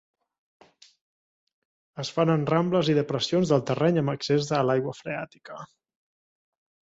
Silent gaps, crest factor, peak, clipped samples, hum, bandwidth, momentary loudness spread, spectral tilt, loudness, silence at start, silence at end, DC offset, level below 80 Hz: none; 18 dB; -8 dBFS; under 0.1%; none; 8 kHz; 17 LU; -6.5 dB/octave; -25 LUFS; 1.95 s; 1.2 s; under 0.1%; -64 dBFS